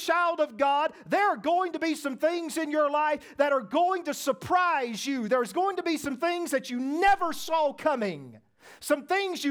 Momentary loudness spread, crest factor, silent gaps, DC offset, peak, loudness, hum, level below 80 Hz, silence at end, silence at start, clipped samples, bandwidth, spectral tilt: 6 LU; 16 dB; none; under 0.1%; -10 dBFS; -27 LUFS; none; -62 dBFS; 0 s; 0 s; under 0.1%; over 20 kHz; -3.5 dB/octave